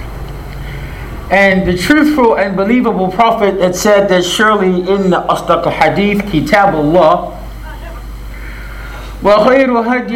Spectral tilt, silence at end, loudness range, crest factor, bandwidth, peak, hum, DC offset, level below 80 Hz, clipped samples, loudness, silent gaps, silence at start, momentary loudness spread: -5.5 dB/octave; 0 s; 3 LU; 12 dB; 17 kHz; 0 dBFS; none; under 0.1%; -30 dBFS; under 0.1%; -11 LUFS; none; 0 s; 19 LU